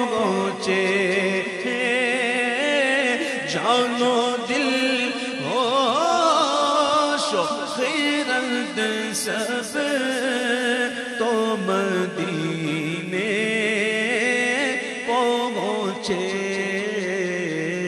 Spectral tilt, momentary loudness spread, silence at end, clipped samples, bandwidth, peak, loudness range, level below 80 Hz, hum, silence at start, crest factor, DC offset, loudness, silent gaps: -3.5 dB/octave; 6 LU; 0 s; under 0.1%; 13 kHz; -6 dBFS; 3 LU; -68 dBFS; none; 0 s; 16 dB; under 0.1%; -22 LUFS; none